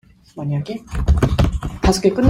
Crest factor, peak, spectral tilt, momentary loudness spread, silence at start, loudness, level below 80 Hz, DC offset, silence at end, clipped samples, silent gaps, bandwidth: 16 dB; -2 dBFS; -6.5 dB/octave; 12 LU; 0.35 s; -20 LUFS; -24 dBFS; under 0.1%; 0 s; under 0.1%; none; 15.5 kHz